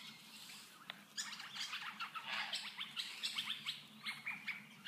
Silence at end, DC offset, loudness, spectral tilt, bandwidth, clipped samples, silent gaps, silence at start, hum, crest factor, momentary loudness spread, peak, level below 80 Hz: 0 s; under 0.1%; -44 LUFS; 0 dB/octave; 15.5 kHz; under 0.1%; none; 0 s; none; 20 dB; 12 LU; -28 dBFS; under -90 dBFS